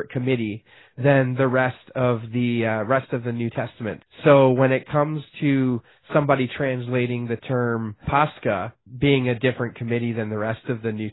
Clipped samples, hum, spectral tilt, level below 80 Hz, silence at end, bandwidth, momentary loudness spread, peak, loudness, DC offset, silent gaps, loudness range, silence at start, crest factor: under 0.1%; none; -12 dB/octave; -52 dBFS; 0 s; 4.1 kHz; 9 LU; -4 dBFS; -22 LUFS; under 0.1%; none; 3 LU; 0 s; 18 dB